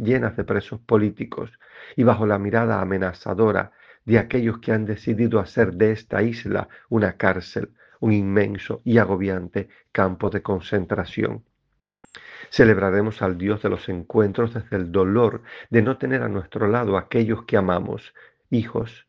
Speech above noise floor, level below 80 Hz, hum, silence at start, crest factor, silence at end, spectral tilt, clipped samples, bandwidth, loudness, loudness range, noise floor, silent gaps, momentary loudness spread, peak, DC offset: 51 dB; -52 dBFS; none; 0 s; 22 dB; 0.15 s; -8.5 dB/octave; under 0.1%; 6.8 kHz; -22 LUFS; 2 LU; -73 dBFS; none; 10 LU; 0 dBFS; under 0.1%